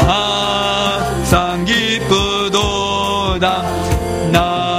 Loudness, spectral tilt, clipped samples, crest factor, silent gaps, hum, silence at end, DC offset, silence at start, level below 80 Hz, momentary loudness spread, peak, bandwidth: -15 LUFS; -4.5 dB/octave; under 0.1%; 16 dB; none; none; 0 s; under 0.1%; 0 s; -28 dBFS; 4 LU; 0 dBFS; 15.5 kHz